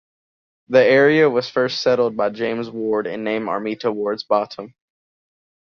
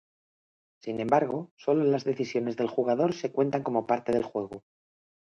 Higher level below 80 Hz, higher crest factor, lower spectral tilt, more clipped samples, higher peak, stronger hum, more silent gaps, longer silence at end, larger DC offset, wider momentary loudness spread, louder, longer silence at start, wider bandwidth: about the same, -64 dBFS vs -68 dBFS; about the same, 18 dB vs 20 dB; second, -5.5 dB/octave vs -7 dB/octave; neither; first, -2 dBFS vs -10 dBFS; neither; second, none vs 1.51-1.57 s; first, 1 s vs 0.65 s; neither; about the same, 11 LU vs 10 LU; first, -19 LUFS vs -28 LUFS; second, 0.7 s vs 0.85 s; second, 6.8 kHz vs 7.8 kHz